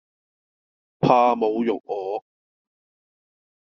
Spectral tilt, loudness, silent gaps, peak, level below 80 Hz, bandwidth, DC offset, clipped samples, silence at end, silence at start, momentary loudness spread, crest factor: -5.5 dB/octave; -22 LUFS; none; -2 dBFS; -66 dBFS; 6.8 kHz; under 0.1%; under 0.1%; 1.5 s; 1 s; 13 LU; 22 dB